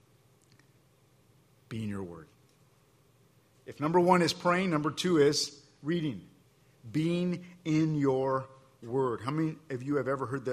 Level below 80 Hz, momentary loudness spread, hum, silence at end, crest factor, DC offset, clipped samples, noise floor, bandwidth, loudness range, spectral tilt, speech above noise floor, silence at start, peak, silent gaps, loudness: -68 dBFS; 16 LU; none; 0 s; 22 dB; under 0.1%; under 0.1%; -65 dBFS; 14.5 kHz; 17 LU; -5.5 dB/octave; 35 dB; 1.7 s; -10 dBFS; none; -30 LUFS